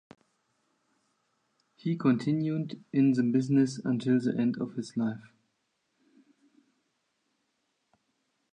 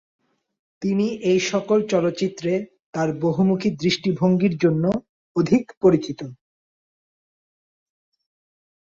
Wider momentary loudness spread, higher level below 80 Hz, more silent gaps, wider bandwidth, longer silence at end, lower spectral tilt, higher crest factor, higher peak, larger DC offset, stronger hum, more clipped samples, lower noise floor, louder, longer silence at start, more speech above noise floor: about the same, 9 LU vs 10 LU; second, -80 dBFS vs -60 dBFS; second, none vs 2.82-2.93 s, 5.09-5.35 s, 5.77-5.81 s; first, 9.6 kHz vs 7.6 kHz; first, 3.25 s vs 2.45 s; about the same, -7.5 dB/octave vs -6.5 dB/octave; about the same, 18 dB vs 18 dB; second, -14 dBFS vs -4 dBFS; neither; neither; neither; second, -78 dBFS vs under -90 dBFS; second, -29 LUFS vs -21 LUFS; first, 1.85 s vs 0.8 s; second, 50 dB vs over 70 dB